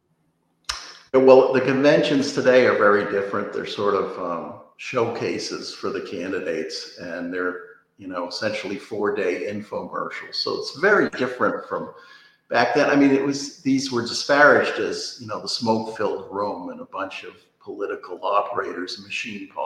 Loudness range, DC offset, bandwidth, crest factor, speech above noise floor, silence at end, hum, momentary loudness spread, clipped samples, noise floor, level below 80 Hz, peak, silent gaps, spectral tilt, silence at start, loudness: 10 LU; under 0.1%; 12 kHz; 22 dB; 46 dB; 0 s; none; 15 LU; under 0.1%; -68 dBFS; -64 dBFS; 0 dBFS; none; -4.5 dB/octave; 0.7 s; -22 LUFS